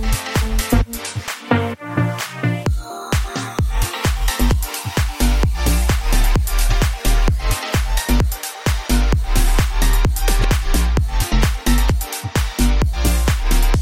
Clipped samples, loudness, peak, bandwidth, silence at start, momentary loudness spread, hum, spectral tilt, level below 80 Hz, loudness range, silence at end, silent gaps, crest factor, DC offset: under 0.1%; -19 LUFS; -2 dBFS; 16.5 kHz; 0 s; 4 LU; none; -4.5 dB/octave; -18 dBFS; 2 LU; 0 s; none; 14 dB; under 0.1%